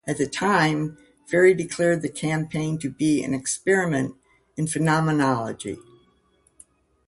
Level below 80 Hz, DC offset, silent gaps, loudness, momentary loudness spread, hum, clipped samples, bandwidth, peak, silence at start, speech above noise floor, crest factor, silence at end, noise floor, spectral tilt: -58 dBFS; under 0.1%; none; -23 LUFS; 13 LU; none; under 0.1%; 11.5 kHz; -6 dBFS; 0.05 s; 41 dB; 18 dB; 1.3 s; -63 dBFS; -5.5 dB/octave